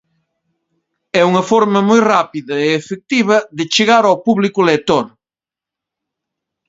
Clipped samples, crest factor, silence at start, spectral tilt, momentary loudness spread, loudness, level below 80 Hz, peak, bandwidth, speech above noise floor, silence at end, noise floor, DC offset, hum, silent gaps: under 0.1%; 16 dB; 1.15 s; -5 dB/octave; 7 LU; -13 LUFS; -58 dBFS; 0 dBFS; 7.8 kHz; 76 dB; 1.6 s; -89 dBFS; under 0.1%; none; none